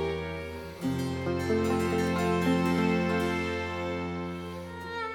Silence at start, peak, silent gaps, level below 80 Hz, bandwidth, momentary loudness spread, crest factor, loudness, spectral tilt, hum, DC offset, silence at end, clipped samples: 0 s; -14 dBFS; none; -50 dBFS; 18 kHz; 11 LU; 16 dB; -30 LUFS; -6.5 dB/octave; none; under 0.1%; 0 s; under 0.1%